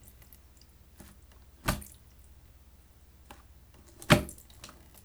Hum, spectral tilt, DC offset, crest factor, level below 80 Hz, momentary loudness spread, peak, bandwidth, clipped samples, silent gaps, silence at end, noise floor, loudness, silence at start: none; -4.5 dB/octave; under 0.1%; 32 dB; -50 dBFS; 29 LU; -4 dBFS; over 20 kHz; under 0.1%; none; 0.4 s; -57 dBFS; -29 LUFS; 1.65 s